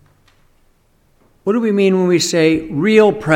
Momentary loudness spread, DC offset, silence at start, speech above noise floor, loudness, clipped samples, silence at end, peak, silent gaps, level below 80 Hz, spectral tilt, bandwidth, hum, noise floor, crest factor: 7 LU; under 0.1%; 1.45 s; 43 dB; -14 LUFS; under 0.1%; 0 s; 0 dBFS; none; -50 dBFS; -5 dB/octave; 16 kHz; none; -56 dBFS; 16 dB